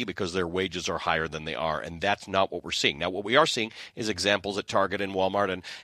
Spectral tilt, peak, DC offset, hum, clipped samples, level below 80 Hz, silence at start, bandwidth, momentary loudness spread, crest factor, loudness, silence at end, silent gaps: -3.5 dB/octave; -6 dBFS; under 0.1%; none; under 0.1%; -56 dBFS; 0 s; 14 kHz; 7 LU; 22 dB; -27 LUFS; 0 s; none